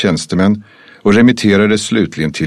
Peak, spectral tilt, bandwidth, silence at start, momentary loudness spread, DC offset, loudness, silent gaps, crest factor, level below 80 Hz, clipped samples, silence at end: 0 dBFS; -5.5 dB/octave; 12 kHz; 0 s; 8 LU; under 0.1%; -12 LUFS; none; 12 dB; -44 dBFS; under 0.1%; 0 s